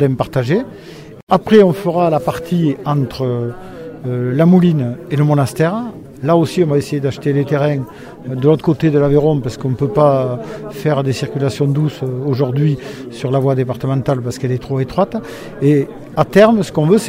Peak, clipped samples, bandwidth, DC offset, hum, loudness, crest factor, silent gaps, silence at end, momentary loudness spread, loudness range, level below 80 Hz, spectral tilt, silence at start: 0 dBFS; under 0.1%; 15.5 kHz; under 0.1%; none; -15 LUFS; 14 dB; 1.23-1.27 s; 0 s; 13 LU; 3 LU; -44 dBFS; -7.5 dB/octave; 0 s